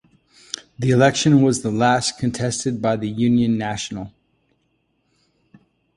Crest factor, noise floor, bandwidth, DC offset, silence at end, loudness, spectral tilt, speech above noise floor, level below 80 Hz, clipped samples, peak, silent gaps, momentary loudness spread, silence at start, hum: 18 dB; -68 dBFS; 11.5 kHz; under 0.1%; 1.9 s; -19 LUFS; -5 dB/octave; 49 dB; -52 dBFS; under 0.1%; -2 dBFS; none; 18 LU; 0.55 s; none